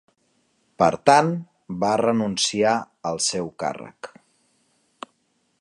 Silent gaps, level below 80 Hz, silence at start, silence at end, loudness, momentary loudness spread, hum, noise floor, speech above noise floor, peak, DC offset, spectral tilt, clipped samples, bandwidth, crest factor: none; -62 dBFS; 0.8 s; 1.55 s; -21 LUFS; 24 LU; none; -69 dBFS; 47 dB; -2 dBFS; under 0.1%; -4 dB/octave; under 0.1%; 11.5 kHz; 22 dB